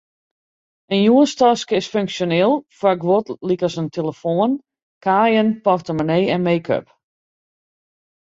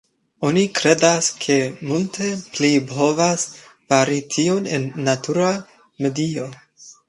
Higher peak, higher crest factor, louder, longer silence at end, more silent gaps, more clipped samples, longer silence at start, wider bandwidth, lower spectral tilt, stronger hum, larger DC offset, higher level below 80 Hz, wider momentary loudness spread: about the same, -2 dBFS vs 0 dBFS; about the same, 16 dB vs 20 dB; about the same, -18 LUFS vs -19 LUFS; first, 1.55 s vs 0.15 s; first, 4.83-5.01 s vs none; neither; first, 0.9 s vs 0.4 s; second, 7.8 kHz vs 11.5 kHz; first, -6 dB/octave vs -4 dB/octave; neither; neither; about the same, -60 dBFS vs -62 dBFS; about the same, 9 LU vs 9 LU